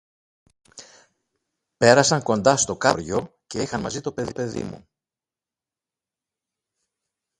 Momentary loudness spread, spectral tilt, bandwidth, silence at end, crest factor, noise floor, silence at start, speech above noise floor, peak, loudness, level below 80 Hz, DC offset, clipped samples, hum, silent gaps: 14 LU; -3.5 dB/octave; 11.5 kHz; 2.6 s; 24 dB; under -90 dBFS; 0.8 s; over 69 dB; 0 dBFS; -21 LUFS; -56 dBFS; under 0.1%; under 0.1%; none; none